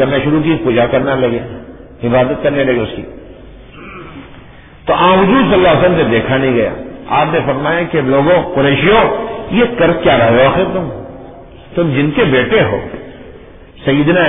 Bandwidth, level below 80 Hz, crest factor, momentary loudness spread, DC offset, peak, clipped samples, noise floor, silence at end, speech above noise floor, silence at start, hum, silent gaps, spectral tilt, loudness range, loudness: 3.9 kHz; -36 dBFS; 12 dB; 19 LU; under 0.1%; 0 dBFS; under 0.1%; -36 dBFS; 0 s; 25 dB; 0 s; none; none; -10.5 dB/octave; 5 LU; -12 LUFS